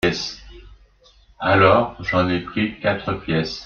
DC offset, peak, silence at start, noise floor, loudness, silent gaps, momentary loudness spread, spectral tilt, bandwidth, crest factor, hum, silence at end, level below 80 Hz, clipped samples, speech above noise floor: under 0.1%; 0 dBFS; 0.05 s; -53 dBFS; -20 LUFS; none; 12 LU; -6 dB/octave; 9.2 kHz; 20 dB; none; 0 s; -46 dBFS; under 0.1%; 34 dB